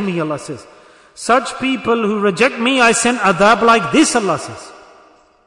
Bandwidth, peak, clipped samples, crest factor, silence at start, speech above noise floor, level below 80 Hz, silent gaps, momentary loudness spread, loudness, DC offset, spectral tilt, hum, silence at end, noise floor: 11 kHz; -2 dBFS; under 0.1%; 14 dB; 0 s; 34 dB; -50 dBFS; none; 15 LU; -14 LUFS; under 0.1%; -3.5 dB/octave; none; 0.75 s; -48 dBFS